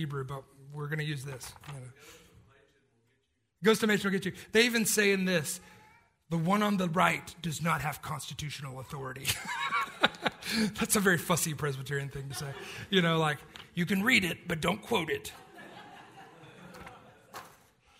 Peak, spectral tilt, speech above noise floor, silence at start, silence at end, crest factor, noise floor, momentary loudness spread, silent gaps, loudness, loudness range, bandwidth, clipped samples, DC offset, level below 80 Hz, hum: -4 dBFS; -4 dB/octave; 45 dB; 0 s; 0.5 s; 28 dB; -76 dBFS; 23 LU; none; -30 LUFS; 8 LU; 16 kHz; under 0.1%; under 0.1%; -62 dBFS; none